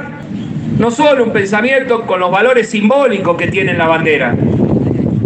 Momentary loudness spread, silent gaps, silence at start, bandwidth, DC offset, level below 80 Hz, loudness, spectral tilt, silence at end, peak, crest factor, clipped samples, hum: 5 LU; none; 0 s; 9 kHz; under 0.1%; -42 dBFS; -12 LUFS; -6.5 dB/octave; 0 s; 0 dBFS; 12 dB; under 0.1%; none